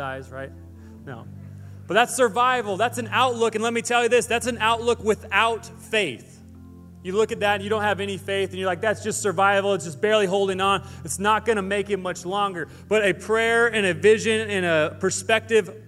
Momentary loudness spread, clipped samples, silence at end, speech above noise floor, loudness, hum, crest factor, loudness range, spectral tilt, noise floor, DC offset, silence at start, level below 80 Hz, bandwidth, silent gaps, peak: 15 LU; under 0.1%; 0 s; 21 dB; -22 LUFS; none; 20 dB; 3 LU; -3.5 dB/octave; -44 dBFS; under 0.1%; 0 s; -56 dBFS; 15 kHz; none; -2 dBFS